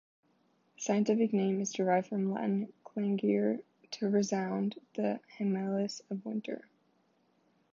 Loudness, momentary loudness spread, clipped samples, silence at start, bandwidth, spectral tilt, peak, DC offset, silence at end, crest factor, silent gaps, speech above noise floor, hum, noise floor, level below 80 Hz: -33 LUFS; 11 LU; under 0.1%; 0.8 s; 7.6 kHz; -6 dB/octave; -16 dBFS; under 0.1%; 1.1 s; 16 dB; none; 40 dB; none; -72 dBFS; -86 dBFS